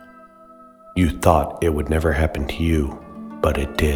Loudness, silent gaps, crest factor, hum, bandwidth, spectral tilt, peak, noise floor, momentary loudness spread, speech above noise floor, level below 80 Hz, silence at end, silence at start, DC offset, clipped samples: -21 LUFS; none; 20 dB; none; 18 kHz; -6.5 dB/octave; 0 dBFS; -46 dBFS; 11 LU; 27 dB; -28 dBFS; 0 s; 0 s; under 0.1%; under 0.1%